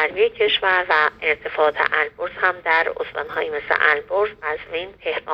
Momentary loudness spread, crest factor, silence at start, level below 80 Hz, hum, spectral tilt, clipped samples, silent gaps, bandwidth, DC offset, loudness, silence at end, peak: 10 LU; 20 dB; 0 s; -56 dBFS; none; -4.5 dB/octave; under 0.1%; none; 6.2 kHz; under 0.1%; -20 LUFS; 0 s; -2 dBFS